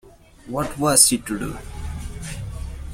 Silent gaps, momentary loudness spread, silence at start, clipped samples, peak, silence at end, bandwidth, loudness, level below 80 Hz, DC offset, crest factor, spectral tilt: none; 20 LU; 0.05 s; under 0.1%; 0 dBFS; 0 s; 16.5 kHz; -18 LUFS; -36 dBFS; under 0.1%; 24 dB; -3 dB/octave